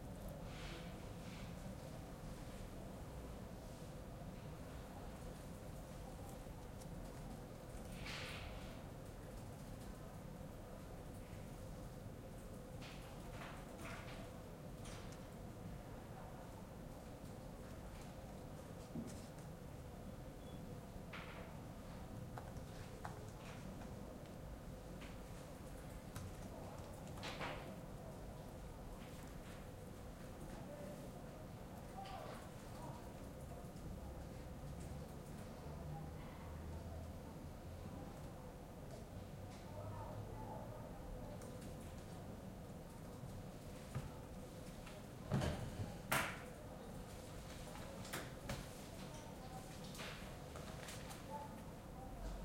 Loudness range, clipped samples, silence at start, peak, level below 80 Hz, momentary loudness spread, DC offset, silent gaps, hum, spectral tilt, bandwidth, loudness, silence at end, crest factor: 6 LU; under 0.1%; 0 s; -24 dBFS; -58 dBFS; 5 LU; under 0.1%; none; none; -5.5 dB/octave; 16.5 kHz; -52 LUFS; 0 s; 28 dB